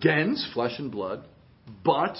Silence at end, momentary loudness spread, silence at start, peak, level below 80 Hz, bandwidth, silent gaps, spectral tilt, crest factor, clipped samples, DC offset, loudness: 0 s; 10 LU; 0 s; -6 dBFS; -62 dBFS; 5.8 kHz; none; -10 dB/octave; 20 dB; under 0.1%; under 0.1%; -28 LUFS